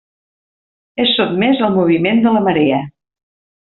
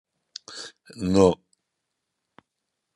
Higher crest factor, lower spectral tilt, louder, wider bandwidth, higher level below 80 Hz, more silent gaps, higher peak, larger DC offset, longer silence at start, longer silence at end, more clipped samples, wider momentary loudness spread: second, 14 dB vs 24 dB; second, -4 dB/octave vs -6.5 dB/octave; first, -14 LUFS vs -22 LUFS; second, 4.3 kHz vs 11.5 kHz; first, -54 dBFS vs -66 dBFS; neither; about the same, -2 dBFS vs -4 dBFS; neither; first, 0.95 s vs 0.5 s; second, 0.8 s vs 1.6 s; neither; second, 7 LU vs 22 LU